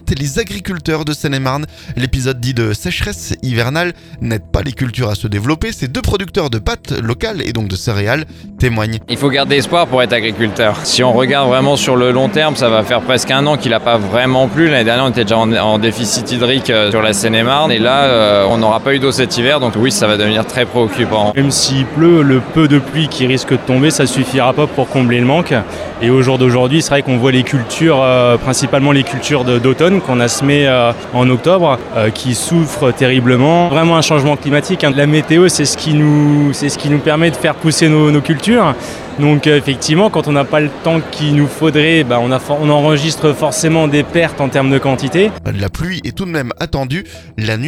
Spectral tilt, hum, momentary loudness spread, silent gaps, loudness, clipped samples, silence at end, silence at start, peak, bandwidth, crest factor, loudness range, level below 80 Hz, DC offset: -5 dB/octave; none; 8 LU; none; -12 LUFS; under 0.1%; 0 s; 0.05 s; 0 dBFS; 15.5 kHz; 12 dB; 6 LU; -34 dBFS; under 0.1%